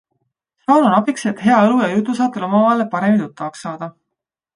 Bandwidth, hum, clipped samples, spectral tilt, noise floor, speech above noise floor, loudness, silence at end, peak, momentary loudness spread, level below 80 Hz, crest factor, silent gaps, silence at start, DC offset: 10.5 kHz; none; under 0.1%; -6.5 dB/octave; -80 dBFS; 65 dB; -16 LUFS; 0.65 s; -2 dBFS; 15 LU; -64 dBFS; 16 dB; none; 0.7 s; under 0.1%